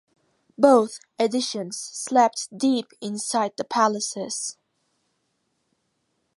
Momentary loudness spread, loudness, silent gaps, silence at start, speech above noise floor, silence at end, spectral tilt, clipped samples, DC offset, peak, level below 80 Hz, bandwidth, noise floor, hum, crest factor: 13 LU; -23 LUFS; none; 0.6 s; 51 dB; 1.85 s; -3 dB/octave; under 0.1%; under 0.1%; -2 dBFS; -76 dBFS; 11.5 kHz; -73 dBFS; none; 22 dB